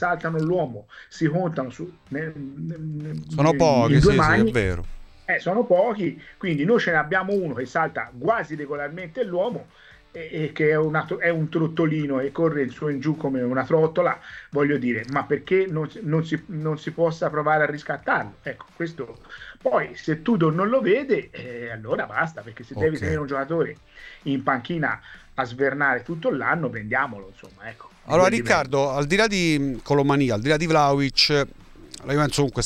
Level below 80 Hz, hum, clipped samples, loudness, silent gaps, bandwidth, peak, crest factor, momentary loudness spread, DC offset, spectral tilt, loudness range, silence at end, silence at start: -44 dBFS; none; under 0.1%; -23 LUFS; none; 13 kHz; -4 dBFS; 20 dB; 15 LU; under 0.1%; -6 dB/octave; 6 LU; 0 s; 0 s